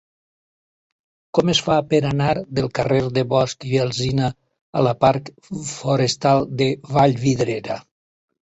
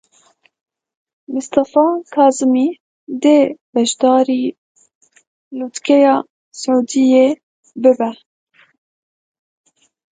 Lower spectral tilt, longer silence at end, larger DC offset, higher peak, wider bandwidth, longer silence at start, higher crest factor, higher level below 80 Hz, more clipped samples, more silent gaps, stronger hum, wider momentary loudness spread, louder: first, -5.5 dB/octave vs -4 dB/octave; second, 0.65 s vs 1.95 s; neither; about the same, -2 dBFS vs 0 dBFS; second, 8.2 kHz vs 9.4 kHz; about the same, 1.35 s vs 1.3 s; about the same, 18 dB vs 16 dB; first, -50 dBFS vs -66 dBFS; neither; second, 4.61-4.73 s vs 2.80-3.07 s, 3.61-3.73 s, 4.58-4.75 s, 4.95-5.01 s, 5.27-5.51 s, 6.30-6.52 s, 7.43-7.63 s; neither; second, 10 LU vs 15 LU; second, -20 LUFS vs -15 LUFS